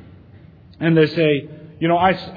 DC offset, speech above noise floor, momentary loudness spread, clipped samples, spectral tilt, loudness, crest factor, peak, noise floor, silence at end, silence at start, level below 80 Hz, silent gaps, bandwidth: under 0.1%; 28 dB; 8 LU; under 0.1%; -9 dB/octave; -18 LUFS; 18 dB; -2 dBFS; -44 dBFS; 0 s; 0.8 s; -52 dBFS; none; 5 kHz